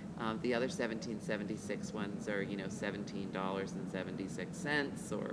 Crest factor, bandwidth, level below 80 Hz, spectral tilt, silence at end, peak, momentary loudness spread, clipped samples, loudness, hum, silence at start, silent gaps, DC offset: 20 dB; 11 kHz; -66 dBFS; -5.5 dB/octave; 0 s; -18 dBFS; 6 LU; under 0.1%; -39 LUFS; none; 0 s; none; under 0.1%